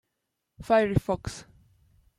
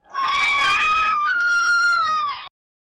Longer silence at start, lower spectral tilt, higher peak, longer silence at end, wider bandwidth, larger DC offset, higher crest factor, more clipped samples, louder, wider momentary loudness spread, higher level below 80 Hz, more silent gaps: first, 0.6 s vs 0.1 s; first, -6.5 dB/octave vs 0.5 dB/octave; about the same, -10 dBFS vs -12 dBFS; first, 0.75 s vs 0.5 s; first, 14.5 kHz vs 12 kHz; neither; first, 20 dB vs 8 dB; neither; second, -26 LUFS vs -18 LUFS; first, 21 LU vs 6 LU; first, -48 dBFS vs -54 dBFS; neither